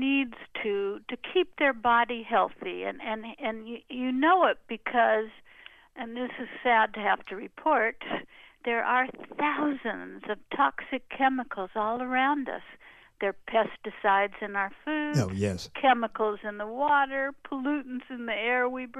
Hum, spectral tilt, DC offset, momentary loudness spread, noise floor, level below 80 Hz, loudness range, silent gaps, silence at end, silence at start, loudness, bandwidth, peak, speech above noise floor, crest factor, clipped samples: none; -5.5 dB/octave; under 0.1%; 12 LU; -53 dBFS; -64 dBFS; 2 LU; none; 0 s; 0 s; -28 LUFS; 12.5 kHz; -10 dBFS; 25 dB; 20 dB; under 0.1%